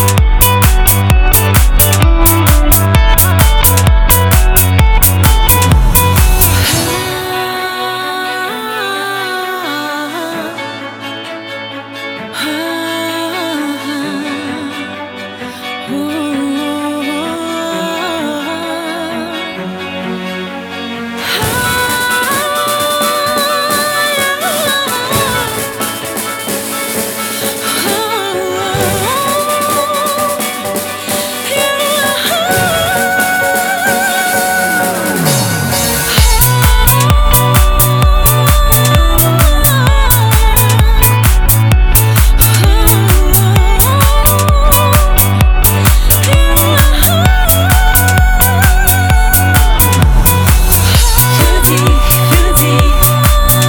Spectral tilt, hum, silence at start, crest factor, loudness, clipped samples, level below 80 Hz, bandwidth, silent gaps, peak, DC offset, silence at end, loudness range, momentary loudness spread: -4 dB/octave; none; 0 s; 10 dB; -10 LUFS; 0.2%; -14 dBFS; over 20 kHz; none; 0 dBFS; under 0.1%; 0 s; 10 LU; 11 LU